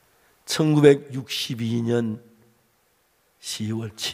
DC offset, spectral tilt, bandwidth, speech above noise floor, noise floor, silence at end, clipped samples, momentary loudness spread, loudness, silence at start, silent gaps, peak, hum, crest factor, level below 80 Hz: under 0.1%; -5.5 dB/octave; 16 kHz; 43 dB; -65 dBFS; 0 s; under 0.1%; 18 LU; -23 LUFS; 0.45 s; none; -2 dBFS; none; 24 dB; -66 dBFS